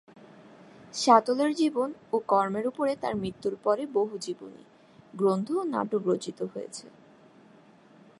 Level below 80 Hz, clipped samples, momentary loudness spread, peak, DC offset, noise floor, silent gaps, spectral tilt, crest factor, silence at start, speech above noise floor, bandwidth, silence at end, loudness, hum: -70 dBFS; under 0.1%; 18 LU; -6 dBFS; under 0.1%; -56 dBFS; none; -5 dB/octave; 24 dB; 0.45 s; 28 dB; 11.5 kHz; 1.3 s; -28 LUFS; none